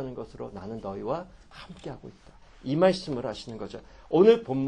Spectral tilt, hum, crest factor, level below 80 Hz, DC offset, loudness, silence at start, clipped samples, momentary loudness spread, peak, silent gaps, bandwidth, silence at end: -7 dB/octave; none; 22 dB; -54 dBFS; under 0.1%; -26 LUFS; 0 s; under 0.1%; 25 LU; -6 dBFS; none; 9.6 kHz; 0 s